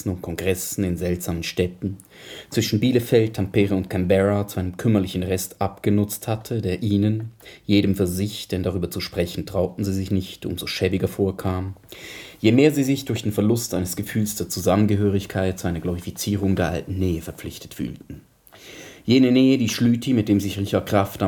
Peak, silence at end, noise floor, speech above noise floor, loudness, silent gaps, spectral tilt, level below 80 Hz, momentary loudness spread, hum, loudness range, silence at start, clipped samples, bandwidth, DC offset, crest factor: -2 dBFS; 0 s; -45 dBFS; 23 dB; -22 LUFS; none; -6 dB/octave; -48 dBFS; 13 LU; none; 4 LU; 0 s; under 0.1%; 19 kHz; under 0.1%; 20 dB